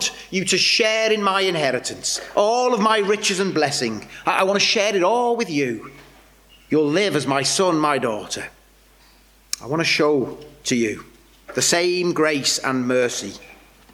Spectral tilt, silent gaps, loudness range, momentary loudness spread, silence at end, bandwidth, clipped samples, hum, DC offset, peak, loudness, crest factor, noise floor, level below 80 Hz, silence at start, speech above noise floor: -3 dB/octave; none; 4 LU; 12 LU; 0.4 s; 19.5 kHz; under 0.1%; none; under 0.1%; -4 dBFS; -20 LUFS; 16 dB; -52 dBFS; -58 dBFS; 0 s; 32 dB